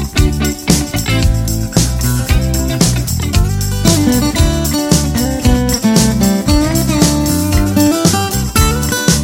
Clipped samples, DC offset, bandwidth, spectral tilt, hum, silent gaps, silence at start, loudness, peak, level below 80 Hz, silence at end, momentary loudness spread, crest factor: under 0.1%; under 0.1%; 17.5 kHz; -4.5 dB/octave; none; none; 0 s; -13 LUFS; 0 dBFS; -18 dBFS; 0 s; 4 LU; 12 dB